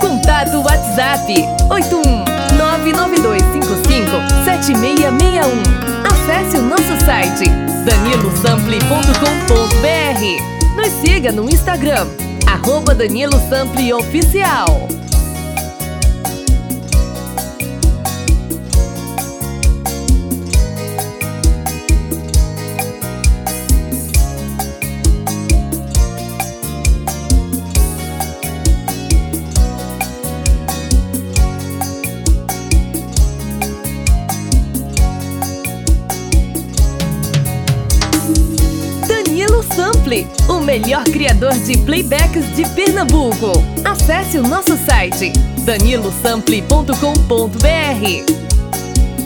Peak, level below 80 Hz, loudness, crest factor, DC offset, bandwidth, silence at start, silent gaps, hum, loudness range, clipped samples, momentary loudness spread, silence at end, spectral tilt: 0 dBFS; -16 dBFS; -14 LUFS; 14 dB; under 0.1%; over 20 kHz; 0 s; none; none; 5 LU; under 0.1%; 8 LU; 0 s; -4.5 dB/octave